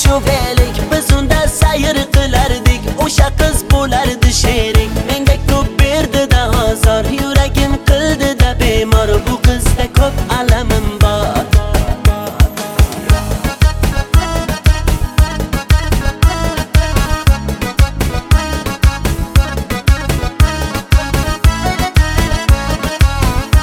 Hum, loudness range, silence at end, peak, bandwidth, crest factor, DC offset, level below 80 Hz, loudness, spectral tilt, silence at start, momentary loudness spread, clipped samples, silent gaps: none; 2 LU; 0 s; 0 dBFS; 17 kHz; 12 dB; under 0.1%; -14 dBFS; -13 LUFS; -5 dB/octave; 0 s; 4 LU; under 0.1%; none